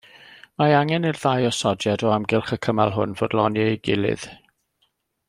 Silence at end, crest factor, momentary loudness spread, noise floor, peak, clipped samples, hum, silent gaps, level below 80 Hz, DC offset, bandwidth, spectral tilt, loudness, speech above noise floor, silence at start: 0.95 s; 20 dB; 6 LU; -70 dBFS; -4 dBFS; under 0.1%; none; none; -58 dBFS; under 0.1%; 12.5 kHz; -5.5 dB/octave; -22 LUFS; 49 dB; 0.3 s